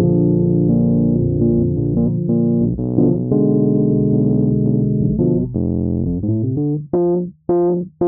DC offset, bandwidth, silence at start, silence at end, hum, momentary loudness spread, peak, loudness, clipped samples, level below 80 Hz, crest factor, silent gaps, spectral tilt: 0.1%; 1.7 kHz; 0 s; 0 s; none; 4 LU; -2 dBFS; -17 LUFS; under 0.1%; -36 dBFS; 14 dB; none; -14.5 dB/octave